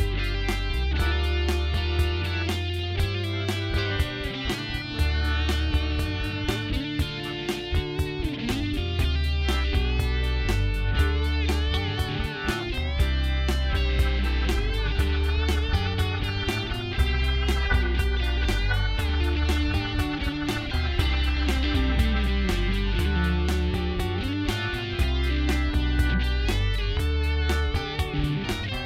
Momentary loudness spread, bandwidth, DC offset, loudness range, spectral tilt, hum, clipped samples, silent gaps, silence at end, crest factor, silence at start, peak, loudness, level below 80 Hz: 4 LU; 15 kHz; under 0.1%; 2 LU; -5.5 dB/octave; none; under 0.1%; none; 0 s; 16 dB; 0 s; -10 dBFS; -26 LUFS; -26 dBFS